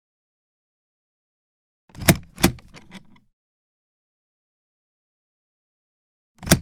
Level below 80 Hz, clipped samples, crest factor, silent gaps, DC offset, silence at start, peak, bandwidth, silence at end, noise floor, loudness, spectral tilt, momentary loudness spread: -44 dBFS; under 0.1%; 28 dB; 3.33-6.35 s; under 0.1%; 2 s; 0 dBFS; 17.5 kHz; 0 s; -46 dBFS; -21 LUFS; -4 dB/octave; 19 LU